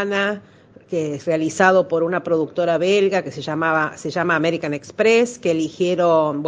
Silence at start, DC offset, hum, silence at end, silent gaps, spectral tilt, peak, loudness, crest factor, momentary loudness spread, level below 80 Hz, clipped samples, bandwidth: 0 s; under 0.1%; none; 0 s; none; -5 dB/octave; 0 dBFS; -19 LUFS; 20 dB; 9 LU; -64 dBFS; under 0.1%; 9.8 kHz